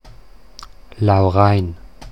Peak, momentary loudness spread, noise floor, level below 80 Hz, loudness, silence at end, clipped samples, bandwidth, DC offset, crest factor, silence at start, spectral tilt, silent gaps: 0 dBFS; 15 LU; -44 dBFS; -40 dBFS; -16 LUFS; 0 s; under 0.1%; 6.2 kHz; 0.8%; 18 dB; 0.6 s; -8.5 dB/octave; none